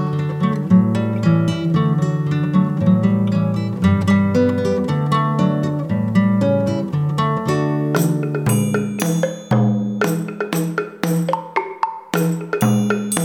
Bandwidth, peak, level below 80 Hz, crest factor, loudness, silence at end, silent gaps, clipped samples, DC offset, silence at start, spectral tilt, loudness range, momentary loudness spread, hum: 19 kHz; -2 dBFS; -52 dBFS; 16 dB; -18 LUFS; 0 s; none; under 0.1%; under 0.1%; 0 s; -7 dB/octave; 3 LU; 6 LU; none